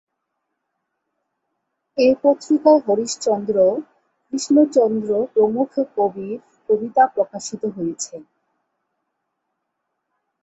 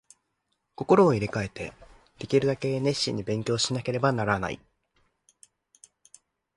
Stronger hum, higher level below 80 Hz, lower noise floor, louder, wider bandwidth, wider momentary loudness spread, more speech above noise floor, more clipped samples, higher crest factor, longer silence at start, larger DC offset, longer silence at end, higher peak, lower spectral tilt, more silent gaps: neither; second, -66 dBFS vs -56 dBFS; about the same, -77 dBFS vs -78 dBFS; first, -19 LUFS vs -26 LUFS; second, 8.2 kHz vs 11.5 kHz; second, 15 LU vs 18 LU; first, 59 dB vs 52 dB; neither; about the same, 18 dB vs 20 dB; first, 1.95 s vs 0.8 s; neither; first, 2.2 s vs 2 s; first, -2 dBFS vs -8 dBFS; about the same, -5 dB/octave vs -5 dB/octave; neither